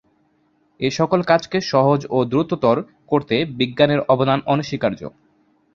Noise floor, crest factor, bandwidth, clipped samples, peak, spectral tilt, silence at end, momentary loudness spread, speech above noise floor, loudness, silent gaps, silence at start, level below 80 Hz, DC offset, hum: -62 dBFS; 18 dB; 7.6 kHz; under 0.1%; -2 dBFS; -6.5 dB/octave; 0.65 s; 7 LU; 43 dB; -19 LUFS; none; 0.8 s; -56 dBFS; under 0.1%; none